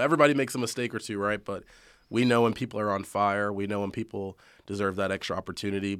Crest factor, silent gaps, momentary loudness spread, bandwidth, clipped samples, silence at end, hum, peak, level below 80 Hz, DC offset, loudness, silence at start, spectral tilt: 22 dB; none; 13 LU; 15.5 kHz; under 0.1%; 0 s; none; -6 dBFS; -64 dBFS; under 0.1%; -28 LUFS; 0 s; -5.5 dB/octave